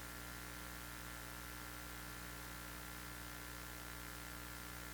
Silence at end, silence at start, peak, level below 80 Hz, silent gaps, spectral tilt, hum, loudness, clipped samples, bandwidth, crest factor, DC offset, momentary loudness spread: 0 s; 0 s; -32 dBFS; -58 dBFS; none; -3 dB/octave; 60 Hz at -55 dBFS; -49 LUFS; under 0.1%; over 20 kHz; 18 dB; under 0.1%; 0 LU